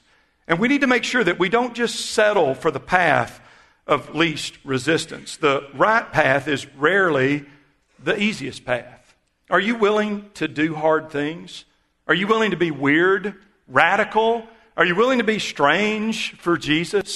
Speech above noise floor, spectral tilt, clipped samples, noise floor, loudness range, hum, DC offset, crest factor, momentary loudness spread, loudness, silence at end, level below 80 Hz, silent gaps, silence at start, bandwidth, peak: 39 dB; -4.5 dB/octave; under 0.1%; -59 dBFS; 4 LU; none; under 0.1%; 20 dB; 10 LU; -20 LUFS; 0 s; -56 dBFS; none; 0.5 s; 12.5 kHz; 0 dBFS